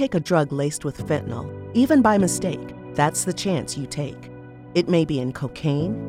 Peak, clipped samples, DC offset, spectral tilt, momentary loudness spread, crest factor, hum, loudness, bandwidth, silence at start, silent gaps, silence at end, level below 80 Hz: -6 dBFS; under 0.1%; under 0.1%; -5.5 dB/octave; 14 LU; 18 dB; none; -23 LUFS; 16 kHz; 0 s; none; 0 s; -50 dBFS